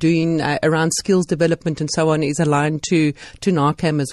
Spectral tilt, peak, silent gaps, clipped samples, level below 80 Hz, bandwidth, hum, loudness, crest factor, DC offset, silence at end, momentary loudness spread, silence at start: -5.5 dB/octave; -4 dBFS; none; under 0.1%; -50 dBFS; 12.5 kHz; none; -18 LUFS; 12 dB; under 0.1%; 0 s; 4 LU; 0 s